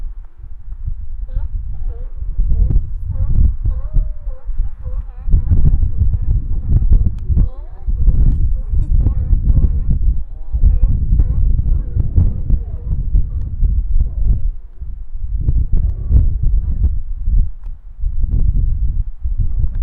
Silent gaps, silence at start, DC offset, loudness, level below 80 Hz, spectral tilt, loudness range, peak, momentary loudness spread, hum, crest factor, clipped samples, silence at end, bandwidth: none; 0 s; under 0.1%; -20 LUFS; -16 dBFS; -12.5 dB/octave; 4 LU; 0 dBFS; 13 LU; none; 14 dB; under 0.1%; 0 s; 1.3 kHz